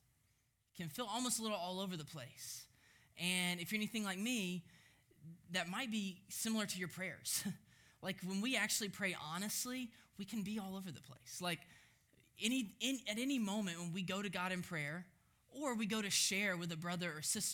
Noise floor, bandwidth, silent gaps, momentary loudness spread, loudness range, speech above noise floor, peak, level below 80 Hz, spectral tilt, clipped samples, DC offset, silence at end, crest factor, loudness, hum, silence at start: -79 dBFS; over 20 kHz; none; 13 LU; 4 LU; 37 dB; -20 dBFS; -80 dBFS; -3 dB/octave; under 0.1%; under 0.1%; 0 s; 24 dB; -41 LUFS; none; 0.75 s